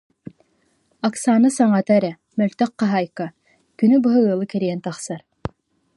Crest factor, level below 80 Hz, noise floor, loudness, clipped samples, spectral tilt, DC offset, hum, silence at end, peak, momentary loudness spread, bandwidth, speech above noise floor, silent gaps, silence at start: 16 dB; -56 dBFS; -64 dBFS; -19 LUFS; under 0.1%; -6.5 dB/octave; under 0.1%; none; 0.5 s; -4 dBFS; 16 LU; 11.5 kHz; 46 dB; none; 1.05 s